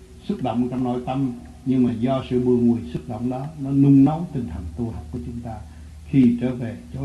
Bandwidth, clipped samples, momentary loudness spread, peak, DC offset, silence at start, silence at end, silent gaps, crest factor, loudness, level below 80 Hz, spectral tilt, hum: 10.5 kHz; under 0.1%; 16 LU; -6 dBFS; under 0.1%; 0 s; 0 s; none; 16 dB; -22 LUFS; -42 dBFS; -9.5 dB/octave; none